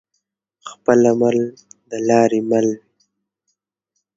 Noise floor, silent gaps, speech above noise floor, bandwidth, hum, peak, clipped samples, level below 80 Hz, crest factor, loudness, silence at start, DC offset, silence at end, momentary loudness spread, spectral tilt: -75 dBFS; none; 59 dB; 7.8 kHz; none; 0 dBFS; under 0.1%; -64 dBFS; 20 dB; -17 LUFS; 0.65 s; under 0.1%; 1.4 s; 18 LU; -6 dB/octave